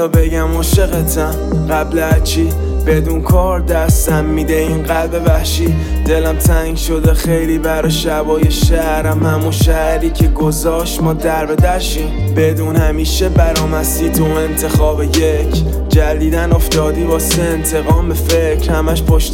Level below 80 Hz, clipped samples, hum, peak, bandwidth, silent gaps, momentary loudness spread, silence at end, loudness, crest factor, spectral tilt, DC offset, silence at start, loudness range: -16 dBFS; under 0.1%; none; 0 dBFS; 17 kHz; none; 3 LU; 0 s; -14 LUFS; 12 dB; -5.5 dB/octave; under 0.1%; 0 s; 1 LU